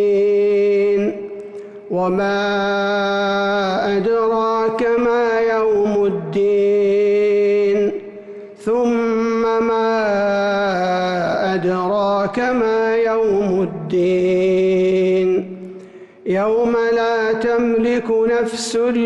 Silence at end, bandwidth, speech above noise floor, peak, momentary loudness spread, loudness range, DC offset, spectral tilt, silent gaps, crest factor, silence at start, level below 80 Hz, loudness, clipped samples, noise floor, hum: 0 s; 11.5 kHz; 22 dB; -10 dBFS; 7 LU; 2 LU; under 0.1%; -6 dB/octave; none; 8 dB; 0 s; -52 dBFS; -17 LUFS; under 0.1%; -38 dBFS; none